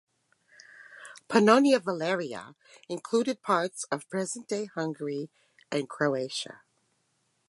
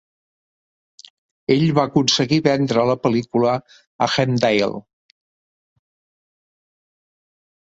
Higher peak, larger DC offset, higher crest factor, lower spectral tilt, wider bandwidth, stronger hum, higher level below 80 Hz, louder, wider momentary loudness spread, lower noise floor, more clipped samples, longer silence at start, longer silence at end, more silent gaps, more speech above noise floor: second, -6 dBFS vs -2 dBFS; neither; about the same, 24 dB vs 20 dB; about the same, -4.5 dB/octave vs -5.5 dB/octave; first, 11.5 kHz vs 8 kHz; neither; second, -80 dBFS vs -58 dBFS; second, -28 LUFS vs -18 LUFS; first, 20 LU vs 8 LU; second, -74 dBFS vs under -90 dBFS; neither; second, 0.8 s vs 1.5 s; second, 0.9 s vs 2.95 s; second, none vs 3.87-3.99 s; second, 46 dB vs over 72 dB